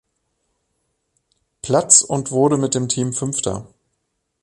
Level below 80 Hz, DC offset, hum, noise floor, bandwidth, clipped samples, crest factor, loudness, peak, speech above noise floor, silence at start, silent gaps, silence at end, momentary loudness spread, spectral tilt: -54 dBFS; under 0.1%; none; -73 dBFS; 12 kHz; under 0.1%; 22 dB; -17 LUFS; 0 dBFS; 55 dB; 1.65 s; none; 0.8 s; 14 LU; -4 dB/octave